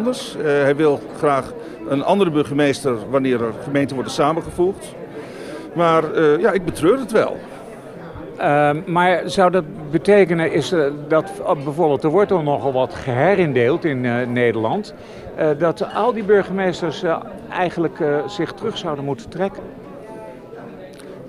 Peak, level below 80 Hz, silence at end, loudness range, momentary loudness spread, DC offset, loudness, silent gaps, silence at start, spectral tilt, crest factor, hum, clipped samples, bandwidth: -2 dBFS; -52 dBFS; 0 s; 5 LU; 18 LU; under 0.1%; -19 LUFS; none; 0 s; -6.5 dB/octave; 16 dB; none; under 0.1%; 13 kHz